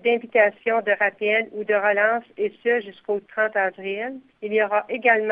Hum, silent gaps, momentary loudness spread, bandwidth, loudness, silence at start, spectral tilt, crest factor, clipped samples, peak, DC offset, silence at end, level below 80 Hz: none; none; 10 LU; 4 kHz; -22 LUFS; 0.05 s; -7.5 dB/octave; 18 dB; under 0.1%; -4 dBFS; under 0.1%; 0 s; -74 dBFS